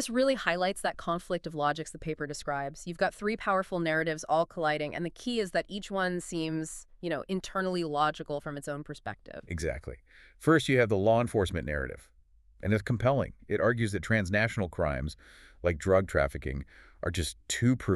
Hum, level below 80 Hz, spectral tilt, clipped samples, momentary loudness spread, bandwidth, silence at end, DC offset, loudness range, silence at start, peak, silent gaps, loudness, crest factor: none; -48 dBFS; -5.5 dB/octave; under 0.1%; 12 LU; 13.5 kHz; 0 s; under 0.1%; 4 LU; 0 s; -10 dBFS; none; -31 LUFS; 20 dB